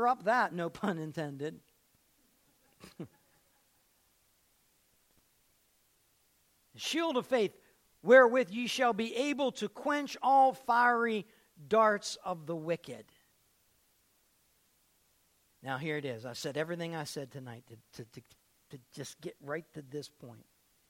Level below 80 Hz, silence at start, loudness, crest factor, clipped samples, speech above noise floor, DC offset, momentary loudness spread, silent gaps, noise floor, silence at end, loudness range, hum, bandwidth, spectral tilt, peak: -78 dBFS; 0 s; -31 LUFS; 24 dB; under 0.1%; 40 dB; under 0.1%; 23 LU; none; -71 dBFS; 0.55 s; 17 LU; none; 16.5 kHz; -4.5 dB/octave; -10 dBFS